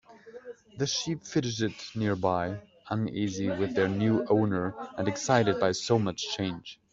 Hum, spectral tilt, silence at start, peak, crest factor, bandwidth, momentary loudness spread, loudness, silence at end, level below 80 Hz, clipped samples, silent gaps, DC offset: none; -5 dB/octave; 0.1 s; -8 dBFS; 20 dB; 7.8 kHz; 10 LU; -29 LUFS; 0.2 s; -64 dBFS; under 0.1%; none; under 0.1%